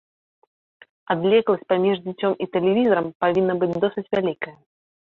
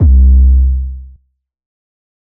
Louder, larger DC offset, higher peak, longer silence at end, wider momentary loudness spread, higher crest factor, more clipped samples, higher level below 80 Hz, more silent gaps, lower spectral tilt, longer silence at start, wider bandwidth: second, -21 LUFS vs -10 LUFS; neither; second, -6 dBFS vs -2 dBFS; second, 0.5 s vs 1.3 s; second, 7 LU vs 18 LU; first, 16 dB vs 10 dB; neither; second, -64 dBFS vs -10 dBFS; first, 3.15-3.20 s vs none; second, -8.5 dB/octave vs -14.5 dB/octave; first, 1.1 s vs 0 s; first, 4.3 kHz vs 0.7 kHz